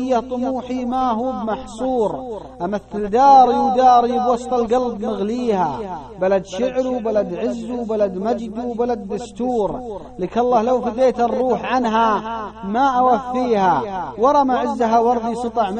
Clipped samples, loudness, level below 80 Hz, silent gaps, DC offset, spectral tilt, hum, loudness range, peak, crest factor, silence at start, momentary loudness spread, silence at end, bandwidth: under 0.1%; -19 LUFS; -46 dBFS; none; under 0.1%; -6 dB/octave; none; 6 LU; -2 dBFS; 16 dB; 0 s; 11 LU; 0 s; 9.2 kHz